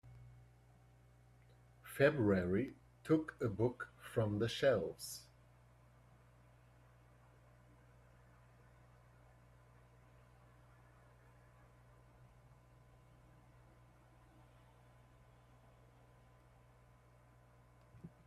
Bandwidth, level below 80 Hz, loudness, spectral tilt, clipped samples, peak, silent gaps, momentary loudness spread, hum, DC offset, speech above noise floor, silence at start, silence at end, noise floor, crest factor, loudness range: 14.5 kHz; -68 dBFS; -38 LUFS; -6.5 dB/octave; under 0.1%; -18 dBFS; none; 26 LU; 60 Hz at -65 dBFS; under 0.1%; 30 dB; 0.05 s; 0.2 s; -66 dBFS; 26 dB; 7 LU